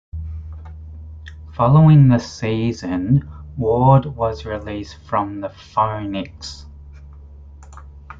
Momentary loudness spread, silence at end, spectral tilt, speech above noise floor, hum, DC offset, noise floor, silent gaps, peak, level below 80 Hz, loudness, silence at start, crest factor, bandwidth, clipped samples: 24 LU; 0.05 s; -8.5 dB/octave; 23 dB; none; under 0.1%; -39 dBFS; none; -2 dBFS; -40 dBFS; -17 LUFS; 0.15 s; 18 dB; 7.4 kHz; under 0.1%